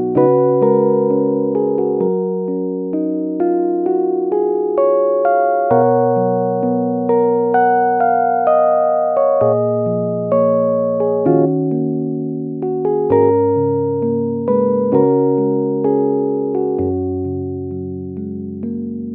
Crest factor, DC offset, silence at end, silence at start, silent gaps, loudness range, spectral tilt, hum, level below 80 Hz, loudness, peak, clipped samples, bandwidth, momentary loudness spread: 14 dB; under 0.1%; 0 s; 0 s; none; 3 LU; -14 dB/octave; none; -58 dBFS; -16 LUFS; 0 dBFS; under 0.1%; 3.1 kHz; 9 LU